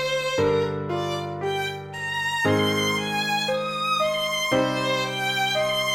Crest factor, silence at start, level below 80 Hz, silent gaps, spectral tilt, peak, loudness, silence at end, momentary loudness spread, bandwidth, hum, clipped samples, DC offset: 16 dB; 0 s; -58 dBFS; none; -3.5 dB/octave; -8 dBFS; -24 LUFS; 0 s; 6 LU; 17 kHz; none; under 0.1%; under 0.1%